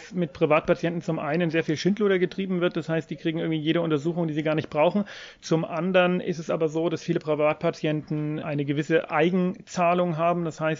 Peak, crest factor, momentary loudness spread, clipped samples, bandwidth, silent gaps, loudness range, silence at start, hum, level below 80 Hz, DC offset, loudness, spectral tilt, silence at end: -8 dBFS; 16 dB; 6 LU; under 0.1%; 7.6 kHz; none; 1 LU; 0 s; none; -62 dBFS; under 0.1%; -25 LUFS; -6.5 dB/octave; 0 s